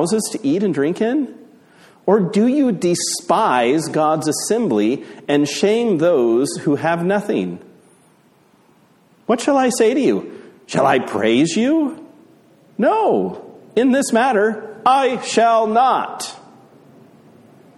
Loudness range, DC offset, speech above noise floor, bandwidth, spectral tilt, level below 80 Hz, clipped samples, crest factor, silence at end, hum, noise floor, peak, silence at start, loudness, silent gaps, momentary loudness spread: 4 LU; under 0.1%; 37 dB; 13.5 kHz; -4.5 dB/octave; -64 dBFS; under 0.1%; 16 dB; 1.4 s; none; -54 dBFS; -2 dBFS; 0 s; -17 LUFS; none; 10 LU